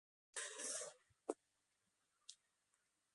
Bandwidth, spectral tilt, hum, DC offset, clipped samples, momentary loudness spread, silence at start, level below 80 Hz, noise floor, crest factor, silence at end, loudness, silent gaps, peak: 11.5 kHz; 0.5 dB/octave; none; under 0.1%; under 0.1%; 17 LU; 0.35 s; under -90 dBFS; -86 dBFS; 28 dB; 0.8 s; -49 LUFS; none; -26 dBFS